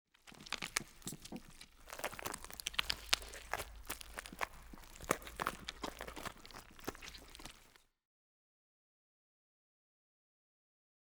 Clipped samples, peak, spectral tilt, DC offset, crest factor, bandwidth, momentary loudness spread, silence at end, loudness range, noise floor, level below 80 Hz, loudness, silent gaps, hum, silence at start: under 0.1%; -10 dBFS; -1.5 dB/octave; under 0.1%; 36 dB; over 20 kHz; 17 LU; 3.25 s; 14 LU; -66 dBFS; -60 dBFS; -43 LUFS; none; none; 0.25 s